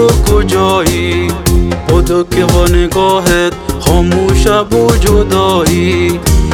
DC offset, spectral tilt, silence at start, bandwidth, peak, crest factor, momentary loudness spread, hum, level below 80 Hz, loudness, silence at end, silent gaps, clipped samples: under 0.1%; -5.5 dB/octave; 0 s; 18 kHz; 0 dBFS; 10 dB; 3 LU; none; -16 dBFS; -10 LUFS; 0 s; none; 1%